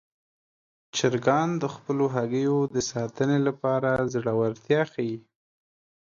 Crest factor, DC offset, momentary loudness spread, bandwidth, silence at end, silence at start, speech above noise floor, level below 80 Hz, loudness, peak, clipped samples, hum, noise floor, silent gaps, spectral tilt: 20 dB; under 0.1%; 7 LU; 7.6 kHz; 0.95 s; 0.95 s; over 65 dB; -62 dBFS; -26 LUFS; -8 dBFS; under 0.1%; none; under -90 dBFS; none; -5.5 dB/octave